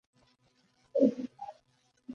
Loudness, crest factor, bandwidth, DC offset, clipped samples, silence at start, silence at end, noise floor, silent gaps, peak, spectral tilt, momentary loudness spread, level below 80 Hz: -31 LUFS; 24 dB; 6.8 kHz; under 0.1%; under 0.1%; 0.95 s; 0 s; -72 dBFS; none; -12 dBFS; -8.5 dB/octave; 20 LU; -82 dBFS